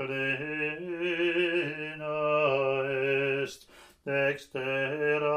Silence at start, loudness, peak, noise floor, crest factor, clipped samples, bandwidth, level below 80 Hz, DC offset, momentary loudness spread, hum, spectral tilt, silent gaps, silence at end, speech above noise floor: 0 s; -29 LUFS; -14 dBFS; -55 dBFS; 16 dB; under 0.1%; 14 kHz; -70 dBFS; under 0.1%; 8 LU; none; -6 dB/octave; none; 0 s; 23 dB